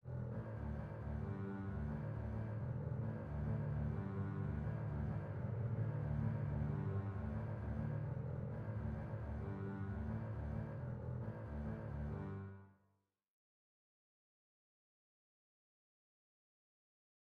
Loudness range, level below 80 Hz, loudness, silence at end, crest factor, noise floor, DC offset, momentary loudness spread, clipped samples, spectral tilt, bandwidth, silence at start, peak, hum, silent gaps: 8 LU; -54 dBFS; -44 LUFS; 4.55 s; 16 dB; -82 dBFS; under 0.1%; 5 LU; under 0.1%; -10.5 dB/octave; 4.5 kHz; 0.05 s; -28 dBFS; none; none